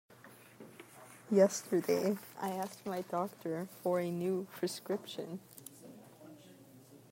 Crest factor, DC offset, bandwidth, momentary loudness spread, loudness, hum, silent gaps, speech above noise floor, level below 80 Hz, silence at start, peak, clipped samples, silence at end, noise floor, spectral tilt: 22 dB; under 0.1%; 16 kHz; 25 LU; -36 LUFS; none; none; 23 dB; -84 dBFS; 0.25 s; -14 dBFS; under 0.1%; 0.15 s; -58 dBFS; -5.5 dB/octave